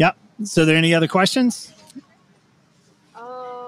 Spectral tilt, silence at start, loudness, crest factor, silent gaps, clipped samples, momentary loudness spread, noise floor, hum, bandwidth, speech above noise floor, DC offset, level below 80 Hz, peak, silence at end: -5 dB/octave; 0 s; -17 LUFS; 18 dB; none; under 0.1%; 22 LU; -57 dBFS; none; 15 kHz; 40 dB; under 0.1%; -60 dBFS; -4 dBFS; 0 s